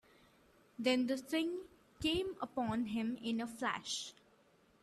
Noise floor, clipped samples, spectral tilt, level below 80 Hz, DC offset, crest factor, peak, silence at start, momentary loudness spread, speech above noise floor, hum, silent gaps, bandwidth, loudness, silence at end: -69 dBFS; under 0.1%; -4 dB/octave; -66 dBFS; under 0.1%; 18 dB; -20 dBFS; 0.8 s; 9 LU; 32 dB; none; none; 13.5 kHz; -38 LUFS; 0.7 s